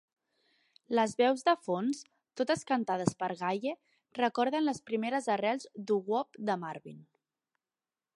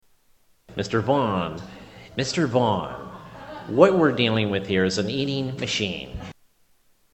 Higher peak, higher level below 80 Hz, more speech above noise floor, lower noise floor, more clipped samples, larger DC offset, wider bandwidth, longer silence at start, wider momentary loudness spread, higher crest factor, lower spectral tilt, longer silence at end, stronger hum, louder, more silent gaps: second, -10 dBFS vs 0 dBFS; second, -78 dBFS vs -52 dBFS; first, over 58 dB vs 39 dB; first, under -90 dBFS vs -61 dBFS; neither; neither; first, 11.5 kHz vs 8.6 kHz; first, 0.9 s vs 0.7 s; second, 12 LU vs 20 LU; about the same, 24 dB vs 24 dB; about the same, -5 dB/octave vs -5.5 dB/octave; first, 1.1 s vs 0.8 s; neither; second, -32 LUFS vs -23 LUFS; neither